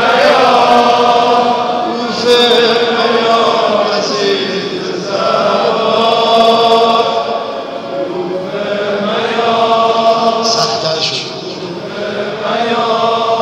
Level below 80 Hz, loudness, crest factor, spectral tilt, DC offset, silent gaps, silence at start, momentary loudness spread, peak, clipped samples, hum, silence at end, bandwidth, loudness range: -56 dBFS; -12 LUFS; 12 dB; -3.5 dB/octave; under 0.1%; none; 0 s; 11 LU; 0 dBFS; under 0.1%; none; 0 s; 13.5 kHz; 4 LU